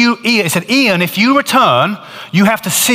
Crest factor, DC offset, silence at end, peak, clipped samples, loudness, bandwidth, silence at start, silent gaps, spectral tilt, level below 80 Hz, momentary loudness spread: 12 dB; under 0.1%; 0 s; 0 dBFS; under 0.1%; -11 LUFS; 16.5 kHz; 0 s; none; -3.5 dB/octave; -58 dBFS; 6 LU